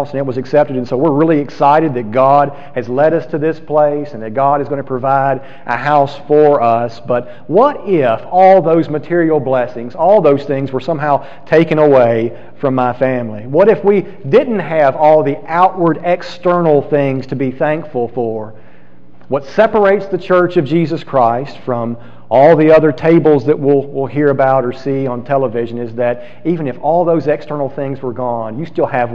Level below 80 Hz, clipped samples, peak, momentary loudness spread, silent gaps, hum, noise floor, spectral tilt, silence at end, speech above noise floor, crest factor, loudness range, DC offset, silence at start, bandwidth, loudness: -52 dBFS; under 0.1%; 0 dBFS; 10 LU; none; none; -44 dBFS; -8.5 dB/octave; 0 s; 32 dB; 12 dB; 5 LU; 3%; 0 s; 7.2 kHz; -13 LUFS